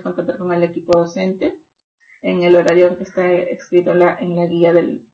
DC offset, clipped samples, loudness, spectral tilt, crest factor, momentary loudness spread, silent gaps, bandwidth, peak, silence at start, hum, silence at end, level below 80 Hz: under 0.1%; under 0.1%; -13 LUFS; -7.5 dB/octave; 12 dB; 8 LU; 1.84-1.98 s; 7.8 kHz; 0 dBFS; 0 s; none; 0.1 s; -52 dBFS